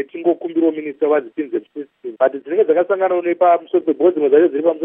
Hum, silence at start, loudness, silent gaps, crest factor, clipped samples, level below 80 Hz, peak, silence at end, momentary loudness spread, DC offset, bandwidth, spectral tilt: none; 0 s; -17 LUFS; none; 14 dB; under 0.1%; -80 dBFS; -2 dBFS; 0 s; 11 LU; under 0.1%; 3.7 kHz; -9.5 dB/octave